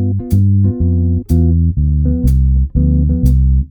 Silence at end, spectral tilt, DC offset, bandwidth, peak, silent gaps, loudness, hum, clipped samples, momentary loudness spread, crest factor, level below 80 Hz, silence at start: 0.05 s; -10.5 dB/octave; under 0.1%; 12.5 kHz; 0 dBFS; none; -13 LUFS; none; under 0.1%; 2 LU; 10 dB; -14 dBFS; 0 s